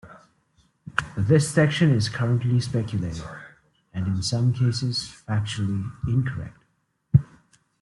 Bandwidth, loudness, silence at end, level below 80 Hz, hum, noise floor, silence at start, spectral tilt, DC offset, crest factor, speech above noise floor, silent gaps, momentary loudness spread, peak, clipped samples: 12 kHz; -24 LUFS; 0.55 s; -50 dBFS; none; -70 dBFS; 0.05 s; -6 dB/octave; under 0.1%; 22 dB; 47 dB; none; 12 LU; -2 dBFS; under 0.1%